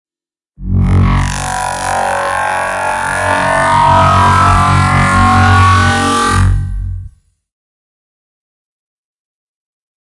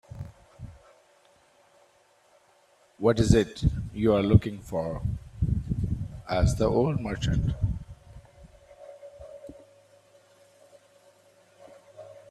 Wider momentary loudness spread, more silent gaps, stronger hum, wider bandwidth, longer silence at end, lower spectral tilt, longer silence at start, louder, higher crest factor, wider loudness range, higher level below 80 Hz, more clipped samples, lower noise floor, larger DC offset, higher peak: second, 9 LU vs 25 LU; neither; neither; about the same, 11.5 kHz vs 12.5 kHz; first, 3 s vs 0.15 s; second, -5 dB/octave vs -7 dB/octave; first, 0.6 s vs 0.15 s; first, -11 LUFS vs -27 LUFS; second, 12 dB vs 24 dB; about the same, 9 LU vs 9 LU; first, -24 dBFS vs -38 dBFS; neither; first, under -90 dBFS vs -62 dBFS; neither; first, 0 dBFS vs -6 dBFS